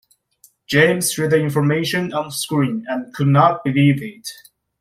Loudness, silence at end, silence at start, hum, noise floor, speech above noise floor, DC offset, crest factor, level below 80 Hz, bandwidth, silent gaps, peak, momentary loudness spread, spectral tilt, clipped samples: -18 LUFS; 0.5 s; 0.7 s; none; -55 dBFS; 38 dB; under 0.1%; 18 dB; -56 dBFS; 15.5 kHz; none; -2 dBFS; 11 LU; -5.5 dB/octave; under 0.1%